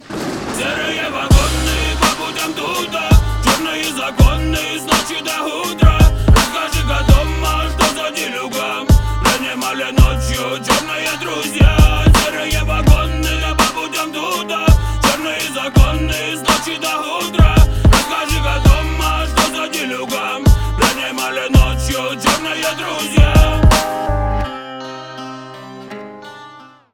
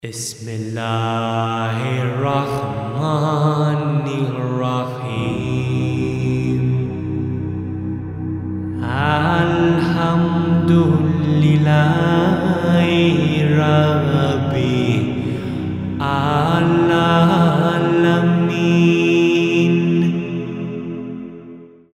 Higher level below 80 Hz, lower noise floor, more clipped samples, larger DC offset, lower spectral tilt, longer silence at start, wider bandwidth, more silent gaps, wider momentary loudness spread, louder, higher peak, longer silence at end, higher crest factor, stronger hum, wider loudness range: first, -18 dBFS vs -46 dBFS; about the same, -39 dBFS vs -39 dBFS; neither; neither; second, -4.5 dB/octave vs -7 dB/octave; about the same, 0.1 s vs 0.05 s; first, 19 kHz vs 12 kHz; neither; second, 8 LU vs 11 LU; about the same, -15 LUFS vs -17 LUFS; about the same, 0 dBFS vs -2 dBFS; about the same, 0.3 s vs 0.25 s; about the same, 14 dB vs 14 dB; neither; second, 2 LU vs 6 LU